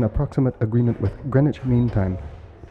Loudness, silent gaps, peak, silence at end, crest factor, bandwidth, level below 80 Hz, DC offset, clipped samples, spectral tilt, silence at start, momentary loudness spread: -22 LUFS; none; -4 dBFS; 0.05 s; 16 dB; 5.2 kHz; -36 dBFS; under 0.1%; under 0.1%; -10.5 dB/octave; 0 s; 7 LU